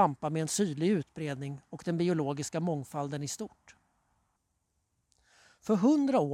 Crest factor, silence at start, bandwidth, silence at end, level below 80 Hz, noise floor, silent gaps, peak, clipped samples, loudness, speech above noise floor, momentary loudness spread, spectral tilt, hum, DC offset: 20 dB; 0 s; 16 kHz; 0 s; -72 dBFS; -79 dBFS; none; -12 dBFS; under 0.1%; -31 LUFS; 48 dB; 14 LU; -6 dB/octave; none; under 0.1%